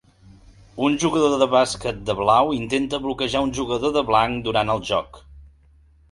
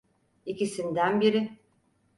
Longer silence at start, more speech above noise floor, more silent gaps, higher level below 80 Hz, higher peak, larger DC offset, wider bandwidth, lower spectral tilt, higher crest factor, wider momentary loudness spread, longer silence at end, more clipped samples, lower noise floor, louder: first, 0.75 s vs 0.45 s; second, 33 dB vs 42 dB; neither; first, -46 dBFS vs -72 dBFS; first, -2 dBFS vs -12 dBFS; neither; about the same, 11.5 kHz vs 11.5 kHz; about the same, -4.5 dB/octave vs -5.5 dB/octave; about the same, 20 dB vs 18 dB; second, 8 LU vs 15 LU; about the same, 0.65 s vs 0.6 s; neither; second, -54 dBFS vs -68 dBFS; first, -21 LUFS vs -27 LUFS